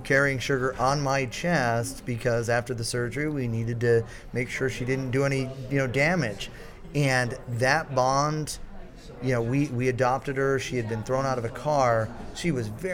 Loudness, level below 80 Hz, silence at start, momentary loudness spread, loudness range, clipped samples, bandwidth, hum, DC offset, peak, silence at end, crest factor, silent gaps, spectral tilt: -26 LUFS; -46 dBFS; 0 s; 9 LU; 2 LU; under 0.1%; 16.5 kHz; none; under 0.1%; -8 dBFS; 0 s; 18 dB; none; -5.5 dB/octave